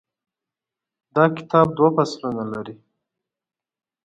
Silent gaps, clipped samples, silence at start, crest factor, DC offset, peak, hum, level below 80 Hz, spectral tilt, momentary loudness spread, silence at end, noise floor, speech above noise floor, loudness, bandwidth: none; under 0.1%; 1.15 s; 20 dB; under 0.1%; -4 dBFS; none; -64 dBFS; -7 dB/octave; 13 LU; 1.3 s; -88 dBFS; 68 dB; -20 LUFS; 8.6 kHz